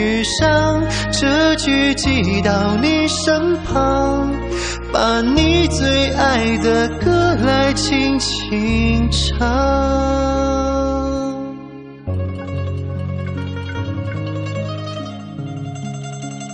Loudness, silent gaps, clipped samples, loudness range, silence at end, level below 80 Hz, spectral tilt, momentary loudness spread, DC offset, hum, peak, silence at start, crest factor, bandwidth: -17 LUFS; none; under 0.1%; 9 LU; 0 s; -28 dBFS; -5 dB/octave; 13 LU; under 0.1%; none; 0 dBFS; 0 s; 16 dB; 10 kHz